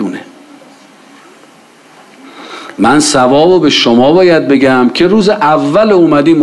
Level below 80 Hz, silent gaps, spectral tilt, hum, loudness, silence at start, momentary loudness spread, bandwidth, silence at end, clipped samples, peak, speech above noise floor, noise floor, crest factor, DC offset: -46 dBFS; none; -4.5 dB/octave; none; -8 LUFS; 0 s; 13 LU; 12 kHz; 0 s; under 0.1%; 0 dBFS; 33 dB; -40 dBFS; 10 dB; under 0.1%